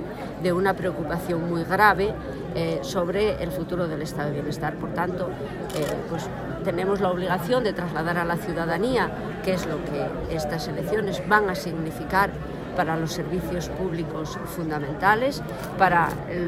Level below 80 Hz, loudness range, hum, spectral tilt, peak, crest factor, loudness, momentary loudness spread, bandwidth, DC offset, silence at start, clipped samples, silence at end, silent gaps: -44 dBFS; 3 LU; none; -6 dB/octave; -4 dBFS; 20 dB; -25 LUFS; 10 LU; 16 kHz; under 0.1%; 0 s; under 0.1%; 0 s; none